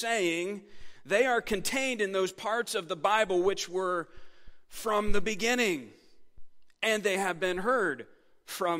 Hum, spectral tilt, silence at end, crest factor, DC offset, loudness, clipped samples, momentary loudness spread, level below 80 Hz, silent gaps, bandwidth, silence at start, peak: none; -3 dB/octave; 0 s; 18 dB; under 0.1%; -29 LUFS; under 0.1%; 11 LU; -48 dBFS; none; 16 kHz; 0 s; -12 dBFS